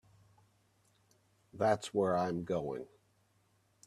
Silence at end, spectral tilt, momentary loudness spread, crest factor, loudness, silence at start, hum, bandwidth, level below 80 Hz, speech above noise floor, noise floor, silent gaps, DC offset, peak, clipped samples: 1 s; -6 dB/octave; 12 LU; 22 dB; -35 LUFS; 1.55 s; none; 13.5 kHz; -72 dBFS; 39 dB; -73 dBFS; none; under 0.1%; -16 dBFS; under 0.1%